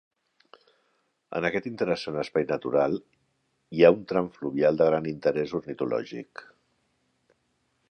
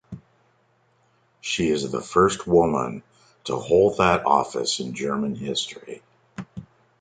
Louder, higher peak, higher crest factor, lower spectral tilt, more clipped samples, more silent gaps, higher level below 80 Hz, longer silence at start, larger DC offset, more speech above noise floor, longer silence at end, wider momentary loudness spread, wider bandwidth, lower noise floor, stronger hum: second, -26 LUFS vs -22 LUFS; about the same, -4 dBFS vs -4 dBFS; about the same, 24 dB vs 20 dB; first, -7 dB/octave vs -4.5 dB/octave; neither; neither; second, -64 dBFS vs -50 dBFS; first, 1.3 s vs 0.1 s; neither; first, 47 dB vs 42 dB; first, 1.5 s vs 0.4 s; second, 15 LU vs 22 LU; about the same, 8.6 kHz vs 9.4 kHz; first, -73 dBFS vs -64 dBFS; neither